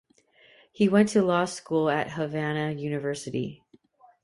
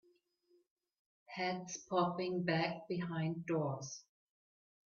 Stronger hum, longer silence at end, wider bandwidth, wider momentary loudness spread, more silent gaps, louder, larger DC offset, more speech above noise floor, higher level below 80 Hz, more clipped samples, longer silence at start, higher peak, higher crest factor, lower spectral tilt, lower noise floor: neither; second, 0.7 s vs 0.9 s; first, 11.5 kHz vs 7.2 kHz; about the same, 10 LU vs 10 LU; neither; first, -26 LUFS vs -38 LUFS; neither; about the same, 34 dB vs 37 dB; first, -66 dBFS vs -80 dBFS; neither; second, 0.8 s vs 1.3 s; first, -8 dBFS vs -20 dBFS; about the same, 20 dB vs 20 dB; about the same, -6 dB/octave vs -5 dB/octave; second, -60 dBFS vs -75 dBFS